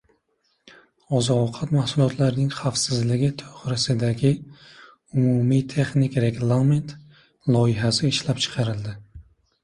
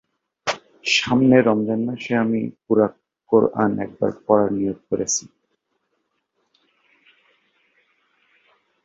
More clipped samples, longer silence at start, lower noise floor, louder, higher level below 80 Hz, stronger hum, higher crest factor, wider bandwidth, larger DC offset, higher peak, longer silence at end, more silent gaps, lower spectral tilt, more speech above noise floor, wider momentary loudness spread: neither; first, 1.1 s vs 0.45 s; about the same, -70 dBFS vs -73 dBFS; about the same, -22 LUFS vs -20 LUFS; first, -52 dBFS vs -58 dBFS; neither; about the same, 16 dB vs 20 dB; first, 11.5 kHz vs 8 kHz; neither; second, -8 dBFS vs -2 dBFS; second, 0.45 s vs 3.6 s; neither; first, -6 dB/octave vs -4.5 dB/octave; second, 48 dB vs 54 dB; about the same, 8 LU vs 10 LU